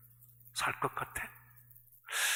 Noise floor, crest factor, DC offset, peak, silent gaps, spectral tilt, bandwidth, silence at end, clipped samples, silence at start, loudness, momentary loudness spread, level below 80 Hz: -60 dBFS; 22 dB; under 0.1%; -18 dBFS; none; -1 dB/octave; 19 kHz; 0 s; under 0.1%; 0.05 s; -37 LUFS; 23 LU; -66 dBFS